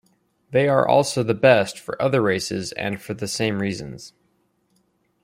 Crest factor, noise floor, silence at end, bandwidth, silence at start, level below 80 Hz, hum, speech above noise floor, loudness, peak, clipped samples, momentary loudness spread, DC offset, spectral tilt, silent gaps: 20 dB; -66 dBFS; 1.15 s; 16 kHz; 0.5 s; -60 dBFS; none; 46 dB; -21 LUFS; -2 dBFS; under 0.1%; 12 LU; under 0.1%; -5 dB/octave; none